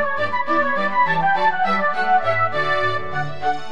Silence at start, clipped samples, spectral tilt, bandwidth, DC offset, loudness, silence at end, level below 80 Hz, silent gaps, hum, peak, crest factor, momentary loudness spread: 0 s; under 0.1%; -5.5 dB/octave; 9.8 kHz; 5%; -19 LUFS; 0 s; -64 dBFS; none; none; -6 dBFS; 14 dB; 6 LU